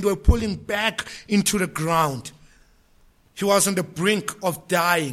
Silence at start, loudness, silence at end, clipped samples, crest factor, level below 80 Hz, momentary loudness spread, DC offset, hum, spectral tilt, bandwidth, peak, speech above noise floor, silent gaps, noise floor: 0 s; -22 LUFS; 0 s; under 0.1%; 18 dB; -32 dBFS; 9 LU; under 0.1%; none; -4 dB/octave; 16.5 kHz; -4 dBFS; 35 dB; none; -57 dBFS